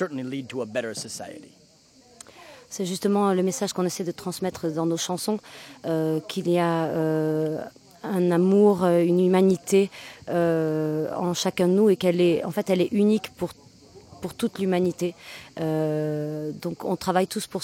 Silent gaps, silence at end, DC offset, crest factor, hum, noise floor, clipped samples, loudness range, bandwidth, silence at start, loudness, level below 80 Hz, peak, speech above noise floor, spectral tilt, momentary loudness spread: none; 0 s; under 0.1%; 18 dB; none; -56 dBFS; under 0.1%; 7 LU; 16.5 kHz; 0 s; -24 LUFS; -64 dBFS; -8 dBFS; 32 dB; -6 dB/octave; 14 LU